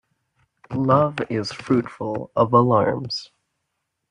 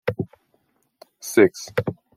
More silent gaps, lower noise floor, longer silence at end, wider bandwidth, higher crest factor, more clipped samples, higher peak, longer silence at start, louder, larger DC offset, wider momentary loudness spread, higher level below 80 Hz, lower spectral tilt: neither; first, -77 dBFS vs -67 dBFS; first, 0.85 s vs 0.25 s; second, 10.5 kHz vs 16.5 kHz; about the same, 18 dB vs 22 dB; neither; about the same, -4 dBFS vs -2 dBFS; first, 0.7 s vs 0.05 s; about the same, -21 LUFS vs -21 LUFS; neither; second, 12 LU vs 16 LU; about the same, -58 dBFS vs -62 dBFS; first, -7 dB/octave vs -5.5 dB/octave